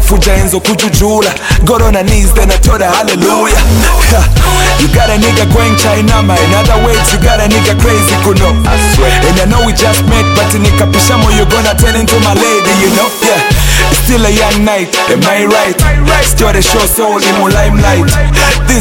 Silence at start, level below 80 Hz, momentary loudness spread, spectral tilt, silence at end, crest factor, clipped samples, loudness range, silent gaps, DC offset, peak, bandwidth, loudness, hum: 0 s; -12 dBFS; 1 LU; -4 dB/octave; 0 s; 6 dB; 0.3%; 1 LU; none; under 0.1%; 0 dBFS; 17.5 kHz; -8 LUFS; none